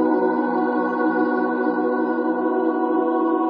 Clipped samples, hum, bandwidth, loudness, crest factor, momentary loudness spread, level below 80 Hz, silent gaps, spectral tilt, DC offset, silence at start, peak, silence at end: under 0.1%; none; 5 kHz; -21 LUFS; 12 dB; 1 LU; -78 dBFS; none; -5 dB/octave; under 0.1%; 0 s; -8 dBFS; 0 s